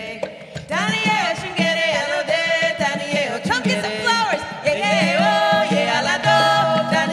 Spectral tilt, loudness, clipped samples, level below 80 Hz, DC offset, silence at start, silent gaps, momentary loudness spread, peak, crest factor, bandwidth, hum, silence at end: -4 dB/octave; -18 LUFS; under 0.1%; -56 dBFS; under 0.1%; 0 s; none; 6 LU; -4 dBFS; 14 dB; 14 kHz; none; 0 s